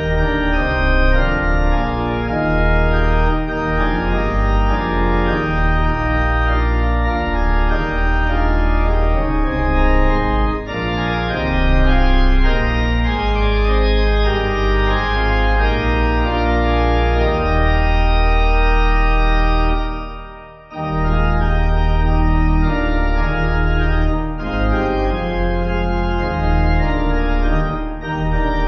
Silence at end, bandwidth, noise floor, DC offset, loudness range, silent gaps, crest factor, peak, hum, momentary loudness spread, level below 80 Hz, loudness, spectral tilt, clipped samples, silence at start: 0 s; 6 kHz; -36 dBFS; under 0.1%; 2 LU; none; 12 dB; -2 dBFS; none; 4 LU; -16 dBFS; -18 LUFS; -8 dB/octave; under 0.1%; 0 s